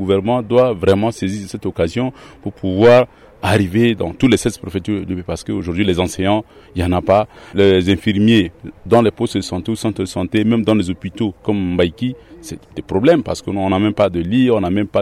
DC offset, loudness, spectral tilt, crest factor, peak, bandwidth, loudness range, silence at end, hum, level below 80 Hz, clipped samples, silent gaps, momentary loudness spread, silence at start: under 0.1%; -16 LUFS; -6.5 dB/octave; 14 dB; -2 dBFS; 14 kHz; 3 LU; 0 s; none; -42 dBFS; under 0.1%; none; 11 LU; 0 s